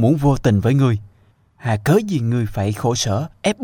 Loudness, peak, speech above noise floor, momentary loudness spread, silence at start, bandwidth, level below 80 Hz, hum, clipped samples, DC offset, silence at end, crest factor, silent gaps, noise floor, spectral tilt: -19 LUFS; -2 dBFS; 38 dB; 6 LU; 0 s; 17 kHz; -40 dBFS; none; under 0.1%; under 0.1%; 0 s; 14 dB; none; -55 dBFS; -6.5 dB/octave